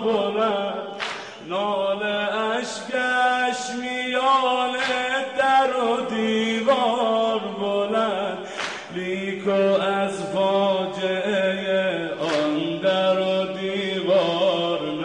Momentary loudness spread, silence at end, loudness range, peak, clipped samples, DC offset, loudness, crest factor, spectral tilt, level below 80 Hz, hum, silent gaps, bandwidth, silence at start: 8 LU; 0 s; 3 LU; -8 dBFS; under 0.1%; under 0.1%; -23 LUFS; 14 dB; -4.5 dB/octave; -68 dBFS; none; none; 10.5 kHz; 0 s